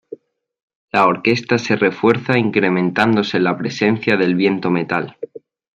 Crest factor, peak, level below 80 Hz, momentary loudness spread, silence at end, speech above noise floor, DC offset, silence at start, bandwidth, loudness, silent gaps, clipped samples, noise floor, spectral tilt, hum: 16 dB; -2 dBFS; -58 dBFS; 6 LU; 0.35 s; 24 dB; under 0.1%; 0.1 s; 9 kHz; -17 LUFS; 0.63-0.68 s, 0.75-0.88 s; under 0.1%; -41 dBFS; -6.5 dB/octave; none